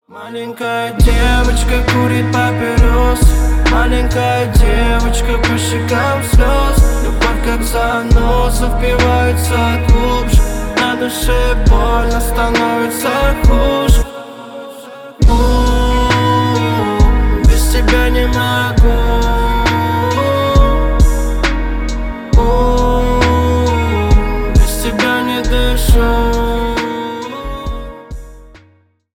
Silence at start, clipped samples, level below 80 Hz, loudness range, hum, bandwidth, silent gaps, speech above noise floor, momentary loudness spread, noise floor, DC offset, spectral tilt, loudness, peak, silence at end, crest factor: 0.1 s; under 0.1%; -14 dBFS; 2 LU; none; 17.5 kHz; none; 40 dB; 8 LU; -51 dBFS; under 0.1%; -5.5 dB/octave; -13 LUFS; 0 dBFS; 0.7 s; 12 dB